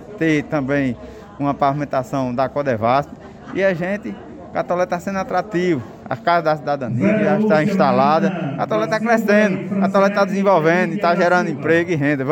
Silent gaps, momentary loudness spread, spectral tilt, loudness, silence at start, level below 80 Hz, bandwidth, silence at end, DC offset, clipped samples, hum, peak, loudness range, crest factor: none; 9 LU; -7 dB/octave; -18 LUFS; 0 s; -52 dBFS; 16.5 kHz; 0 s; under 0.1%; under 0.1%; none; -4 dBFS; 5 LU; 14 dB